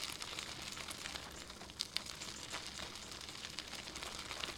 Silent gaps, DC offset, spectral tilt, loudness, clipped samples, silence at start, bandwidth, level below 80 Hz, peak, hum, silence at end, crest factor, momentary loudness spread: none; under 0.1%; -1 dB/octave; -44 LUFS; under 0.1%; 0 s; 18 kHz; -62 dBFS; -14 dBFS; none; 0 s; 32 dB; 6 LU